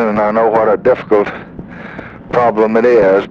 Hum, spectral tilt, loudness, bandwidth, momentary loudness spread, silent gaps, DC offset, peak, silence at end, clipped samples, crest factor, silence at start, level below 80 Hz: none; -8 dB/octave; -12 LUFS; 6.8 kHz; 19 LU; none; under 0.1%; -2 dBFS; 0 s; under 0.1%; 12 dB; 0 s; -44 dBFS